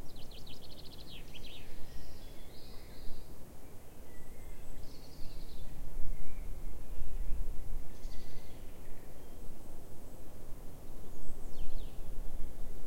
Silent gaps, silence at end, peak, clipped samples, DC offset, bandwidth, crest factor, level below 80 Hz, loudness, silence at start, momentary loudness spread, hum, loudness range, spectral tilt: none; 0 s; -14 dBFS; under 0.1%; under 0.1%; 15.5 kHz; 14 dB; -42 dBFS; -50 LUFS; 0 s; 6 LU; none; 5 LU; -5 dB/octave